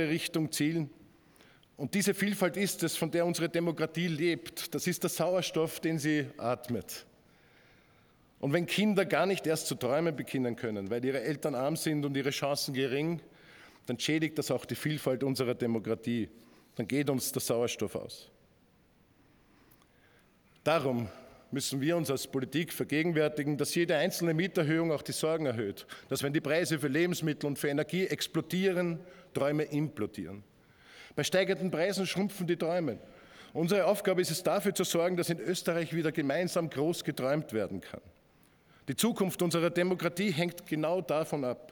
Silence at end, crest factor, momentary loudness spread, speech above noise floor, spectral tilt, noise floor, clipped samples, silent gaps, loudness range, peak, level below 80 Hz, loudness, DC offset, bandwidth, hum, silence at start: 0.05 s; 20 dB; 9 LU; 34 dB; -5 dB/octave; -65 dBFS; under 0.1%; none; 4 LU; -12 dBFS; -72 dBFS; -32 LUFS; under 0.1%; 19.5 kHz; none; 0 s